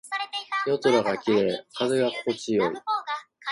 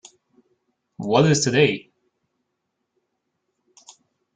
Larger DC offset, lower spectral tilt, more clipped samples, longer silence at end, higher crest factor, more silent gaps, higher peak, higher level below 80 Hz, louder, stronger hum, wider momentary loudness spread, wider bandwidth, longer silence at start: neither; about the same, -4.5 dB/octave vs -4.5 dB/octave; neither; second, 0 s vs 2.55 s; about the same, 18 dB vs 22 dB; neither; second, -8 dBFS vs -4 dBFS; second, -68 dBFS vs -60 dBFS; second, -26 LUFS vs -19 LUFS; neither; second, 8 LU vs 15 LU; first, 11.5 kHz vs 9.4 kHz; second, 0.05 s vs 1 s